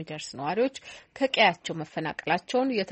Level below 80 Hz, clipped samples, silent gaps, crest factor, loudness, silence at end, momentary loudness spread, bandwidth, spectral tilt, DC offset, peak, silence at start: -68 dBFS; under 0.1%; none; 22 dB; -27 LUFS; 0 s; 14 LU; 8.4 kHz; -4 dB/octave; under 0.1%; -6 dBFS; 0 s